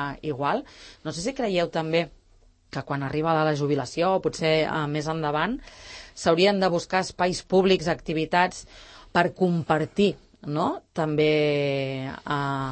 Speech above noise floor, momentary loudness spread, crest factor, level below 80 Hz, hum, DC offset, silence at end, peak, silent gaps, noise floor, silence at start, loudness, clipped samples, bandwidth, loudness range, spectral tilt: 33 dB; 14 LU; 18 dB; -54 dBFS; none; under 0.1%; 0 s; -6 dBFS; none; -58 dBFS; 0 s; -25 LUFS; under 0.1%; 8.8 kHz; 3 LU; -5.5 dB/octave